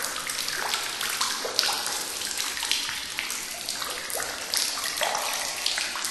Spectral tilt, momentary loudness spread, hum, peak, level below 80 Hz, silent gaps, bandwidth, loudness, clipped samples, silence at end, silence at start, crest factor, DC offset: 1 dB/octave; 5 LU; none; 0 dBFS; -60 dBFS; none; 14.5 kHz; -27 LUFS; under 0.1%; 0 s; 0 s; 30 dB; under 0.1%